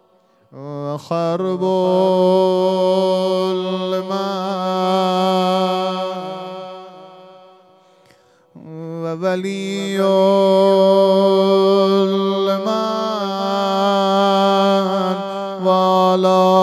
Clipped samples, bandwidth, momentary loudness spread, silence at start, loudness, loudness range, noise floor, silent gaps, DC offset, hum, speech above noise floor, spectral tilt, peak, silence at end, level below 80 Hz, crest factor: under 0.1%; 13.5 kHz; 13 LU; 0.55 s; -17 LUFS; 12 LU; -56 dBFS; none; under 0.1%; none; 39 dB; -6.5 dB/octave; -2 dBFS; 0 s; -72 dBFS; 14 dB